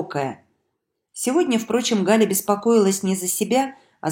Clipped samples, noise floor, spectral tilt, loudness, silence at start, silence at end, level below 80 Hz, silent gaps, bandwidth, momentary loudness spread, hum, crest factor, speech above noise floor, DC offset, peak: under 0.1%; -76 dBFS; -4 dB/octave; -20 LUFS; 0 s; 0 s; -66 dBFS; none; 16.5 kHz; 11 LU; none; 18 dB; 57 dB; under 0.1%; -4 dBFS